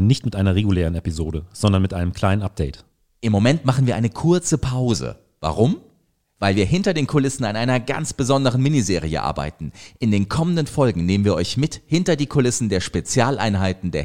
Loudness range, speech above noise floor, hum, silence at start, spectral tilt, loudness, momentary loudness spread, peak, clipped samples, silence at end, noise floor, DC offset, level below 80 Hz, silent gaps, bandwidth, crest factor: 1 LU; 44 dB; none; 0 s; -6 dB/octave; -20 LUFS; 8 LU; -2 dBFS; under 0.1%; 0 s; -63 dBFS; 0.6%; -38 dBFS; none; 15 kHz; 16 dB